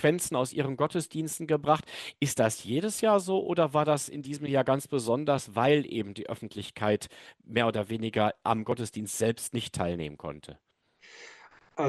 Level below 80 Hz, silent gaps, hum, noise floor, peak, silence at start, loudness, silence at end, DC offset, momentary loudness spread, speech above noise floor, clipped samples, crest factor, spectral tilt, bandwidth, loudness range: -64 dBFS; none; none; -57 dBFS; -10 dBFS; 0 s; -29 LUFS; 0 s; under 0.1%; 13 LU; 28 dB; under 0.1%; 20 dB; -5 dB/octave; 13 kHz; 4 LU